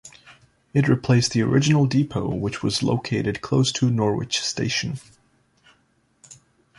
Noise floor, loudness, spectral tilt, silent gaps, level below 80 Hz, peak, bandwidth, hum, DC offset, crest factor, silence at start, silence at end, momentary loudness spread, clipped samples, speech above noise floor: -64 dBFS; -22 LUFS; -5.5 dB/octave; none; -52 dBFS; -4 dBFS; 11.5 kHz; none; under 0.1%; 18 dB; 0.05 s; 0.45 s; 7 LU; under 0.1%; 43 dB